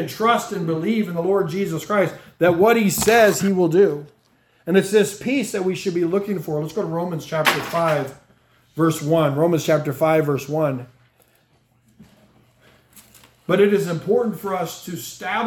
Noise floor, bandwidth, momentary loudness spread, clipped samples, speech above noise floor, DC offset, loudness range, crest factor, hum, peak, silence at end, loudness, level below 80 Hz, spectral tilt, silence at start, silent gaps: -60 dBFS; 18 kHz; 10 LU; under 0.1%; 41 dB; under 0.1%; 7 LU; 18 dB; none; -2 dBFS; 0 s; -20 LUFS; -58 dBFS; -5.5 dB/octave; 0 s; none